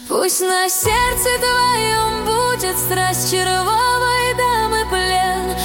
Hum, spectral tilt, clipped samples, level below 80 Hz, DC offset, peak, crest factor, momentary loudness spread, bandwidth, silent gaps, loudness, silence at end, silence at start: none; -2.5 dB/octave; under 0.1%; -34 dBFS; under 0.1%; -4 dBFS; 12 dB; 3 LU; 17 kHz; none; -16 LUFS; 0 s; 0 s